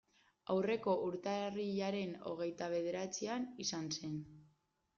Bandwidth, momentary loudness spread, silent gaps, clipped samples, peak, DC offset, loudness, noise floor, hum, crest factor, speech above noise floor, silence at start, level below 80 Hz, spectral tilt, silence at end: 7.4 kHz; 7 LU; none; under 0.1%; -24 dBFS; under 0.1%; -40 LUFS; -77 dBFS; none; 16 dB; 38 dB; 0.5 s; -78 dBFS; -4.5 dB/octave; 0.5 s